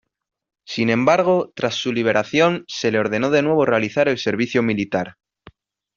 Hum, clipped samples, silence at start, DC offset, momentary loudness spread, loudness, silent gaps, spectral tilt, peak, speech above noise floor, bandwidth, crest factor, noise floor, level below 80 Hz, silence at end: none; under 0.1%; 0.7 s; under 0.1%; 7 LU; -19 LUFS; none; -4 dB/octave; -2 dBFS; 31 dB; 7.4 kHz; 18 dB; -50 dBFS; -60 dBFS; 0.85 s